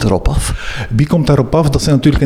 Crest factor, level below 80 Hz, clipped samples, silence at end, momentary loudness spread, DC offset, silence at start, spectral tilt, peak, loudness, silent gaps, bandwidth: 12 dB; -22 dBFS; under 0.1%; 0 s; 7 LU; under 0.1%; 0 s; -6.5 dB/octave; 0 dBFS; -13 LUFS; none; 14.5 kHz